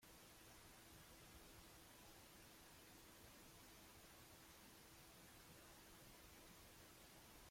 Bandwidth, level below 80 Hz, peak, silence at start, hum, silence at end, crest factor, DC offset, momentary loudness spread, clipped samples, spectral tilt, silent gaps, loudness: 16.5 kHz; -76 dBFS; -50 dBFS; 0 s; none; 0 s; 14 dB; under 0.1%; 0 LU; under 0.1%; -3 dB/octave; none; -64 LUFS